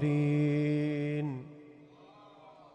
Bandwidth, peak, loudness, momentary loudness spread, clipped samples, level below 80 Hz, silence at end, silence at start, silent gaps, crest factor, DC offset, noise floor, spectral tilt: 8.6 kHz; -20 dBFS; -31 LUFS; 19 LU; under 0.1%; -72 dBFS; 0.2 s; 0 s; none; 14 dB; under 0.1%; -56 dBFS; -9 dB/octave